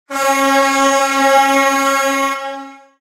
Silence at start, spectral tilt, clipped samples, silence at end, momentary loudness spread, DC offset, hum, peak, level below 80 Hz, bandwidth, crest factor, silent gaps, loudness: 0.1 s; -0.5 dB/octave; under 0.1%; 0.25 s; 10 LU; under 0.1%; none; 0 dBFS; -58 dBFS; 16 kHz; 14 dB; none; -13 LUFS